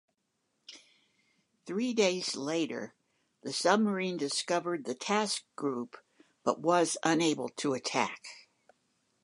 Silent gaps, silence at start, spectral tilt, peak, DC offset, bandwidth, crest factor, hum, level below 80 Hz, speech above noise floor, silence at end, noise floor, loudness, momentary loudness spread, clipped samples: none; 0.7 s; -3.5 dB/octave; -10 dBFS; under 0.1%; 11.5 kHz; 22 dB; none; -84 dBFS; 49 dB; 0.85 s; -80 dBFS; -31 LUFS; 18 LU; under 0.1%